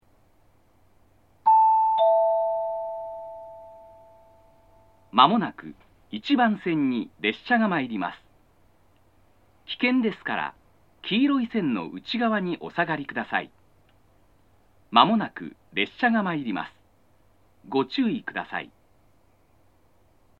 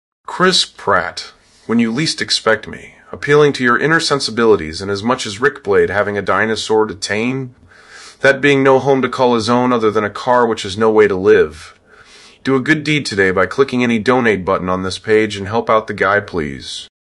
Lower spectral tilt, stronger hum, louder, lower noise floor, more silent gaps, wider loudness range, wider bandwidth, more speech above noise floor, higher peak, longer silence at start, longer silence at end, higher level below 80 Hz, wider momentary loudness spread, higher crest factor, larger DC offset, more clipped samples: first, -7 dB/octave vs -4.5 dB/octave; neither; second, -24 LUFS vs -14 LUFS; first, -62 dBFS vs -44 dBFS; neither; first, 6 LU vs 3 LU; second, 6.8 kHz vs 11.5 kHz; first, 38 dB vs 29 dB; about the same, 0 dBFS vs 0 dBFS; first, 1.45 s vs 0.3 s; first, 1.75 s vs 0.35 s; second, -68 dBFS vs -50 dBFS; first, 18 LU vs 11 LU; first, 26 dB vs 16 dB; neither; neither